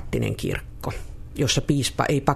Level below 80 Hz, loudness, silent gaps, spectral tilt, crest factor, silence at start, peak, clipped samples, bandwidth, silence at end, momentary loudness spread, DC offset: -38 dBFS; -25 LUFS; none; -4.5 dB/octave; 20 dB; 0 s; -4 dBFS; under 0.1%; 14 kHz; 0 s; 12 LU; under 0.1%